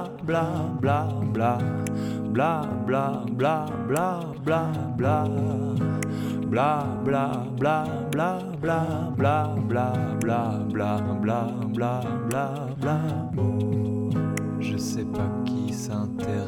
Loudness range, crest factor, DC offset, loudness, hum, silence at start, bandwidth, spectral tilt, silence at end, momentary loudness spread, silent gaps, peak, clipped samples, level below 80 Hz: 1 LU; 14 dB; under 0.1%; -26 LUFS; none; 0 s; 17 kHz; -7.5 dB/octave; 0 s; 4 LU; none; -12 dBFS; under 0.1%; -54 dBFS